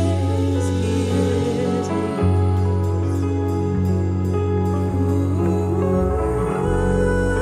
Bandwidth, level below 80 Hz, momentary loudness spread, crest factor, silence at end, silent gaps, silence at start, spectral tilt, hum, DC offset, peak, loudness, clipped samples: 11 kHz; -32 dBFS; 2 LU; 12 dB; 0 s; none; 0 s; -7.5 dB/octave; none; under 0.1%; -6 dBFS; -20 LUFS; under 0.1%